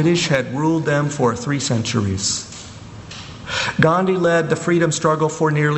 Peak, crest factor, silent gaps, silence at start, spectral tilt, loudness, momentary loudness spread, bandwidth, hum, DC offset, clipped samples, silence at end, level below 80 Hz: 0 dBFS; 18 dB; none; 0 s; -5 dB/octave; -18 LUFS; 18 LU; 8.4 kHz; none; under 0.1%; under 0.1%; 0 s; -50 dBFS